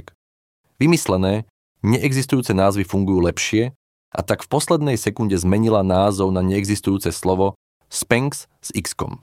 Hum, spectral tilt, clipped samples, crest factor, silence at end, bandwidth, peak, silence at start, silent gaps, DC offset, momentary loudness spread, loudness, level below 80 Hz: none; -5.5 dB/octave; under 0.1%; 20 dB; 0.05 s; 16.5 kHz; 0 dBFS; 0.8 s; 1.50-1.75 s, 3.76-4.12 s, 7.55-7.81 s; under 0.1%; 9 LU; -20 LUFS; -46 dBFS